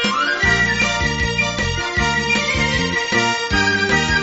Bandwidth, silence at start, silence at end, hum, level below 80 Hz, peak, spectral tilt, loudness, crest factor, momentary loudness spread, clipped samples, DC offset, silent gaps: 8 kHz; 0 s; 0 s; none; -32 dBFS; -4 dBFS; -2 dB/octave; -17 LUFS; 14 dB; 3 LU; under 0.1%; under 0.1%; none